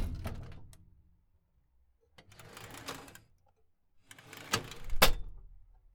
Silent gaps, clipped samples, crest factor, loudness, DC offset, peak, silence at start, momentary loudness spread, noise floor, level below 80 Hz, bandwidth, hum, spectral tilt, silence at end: none; under 0.1%; 30 dB; -34 LUFS; under 0.1%; -6 dBFS; 0 s; 27 LU; -71 dBFS; -42 dBFS; 19 kHz; none; -2.5 dB/octave; 0.4 s